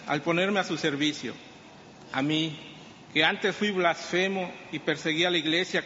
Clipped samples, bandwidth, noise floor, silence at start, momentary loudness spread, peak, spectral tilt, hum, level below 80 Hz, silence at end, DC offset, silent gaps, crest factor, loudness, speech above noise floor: under 0.1%; 8 kHz; -49 dBFS; 0 s; 12 LU; -8 dBFS; -2.5 dB/octave; none; -70 dBFS; 0 s; under 0.1%; none; 20 dB; -27 LUFS; 22 dB